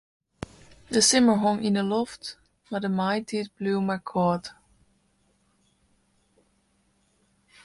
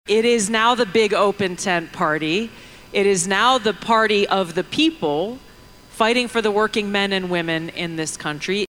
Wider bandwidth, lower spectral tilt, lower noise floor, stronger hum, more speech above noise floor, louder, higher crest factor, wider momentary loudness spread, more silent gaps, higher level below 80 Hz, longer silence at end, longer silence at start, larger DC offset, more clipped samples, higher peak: second, 11.5 kHz vs 16.5 kHz; about the same, -4 dB/octave vs -3.5 dB/octave; first, -68 dBFS vs -45 dBFS; neither; first, 44 dB vs 26 dB; second, -25 LUFS vs -19 LUFS; first, 22 dB vs 16 dB; first, 23 LU vs 9 LU; neither; second, -62 dBFS vs -52 dBFS; first, 3.15 s vs 0 s; first, 0.9 s vs 0.05 s; neither; neither; about the same, -6 dBFS vs -4 dBFS